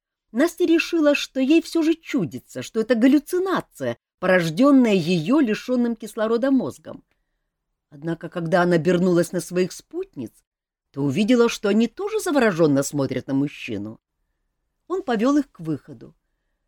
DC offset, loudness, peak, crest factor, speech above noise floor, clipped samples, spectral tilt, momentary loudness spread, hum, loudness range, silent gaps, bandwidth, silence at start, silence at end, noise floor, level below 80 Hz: under 0.1%; -21 LUFS; -6 dBFS; 16 dB; 57 dB; under 0.1%; -6 dB/octave; 14 LU; none; 4 LU; 4.14-4.18 s, 10.47-10.52 s; 19 kHz; 0.35 s; 0.6 s; -78 dBFS; -60 dBFS